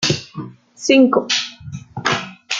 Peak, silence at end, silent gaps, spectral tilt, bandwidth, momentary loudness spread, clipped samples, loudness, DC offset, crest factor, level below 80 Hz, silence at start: -2 dBFS; 0 s; none; -3.5 dB/octave; 9 kHz; 21 LU; under 0.1%; -17 LUFS; under 0.1%; 16 dB; -56 dBFS; 0 s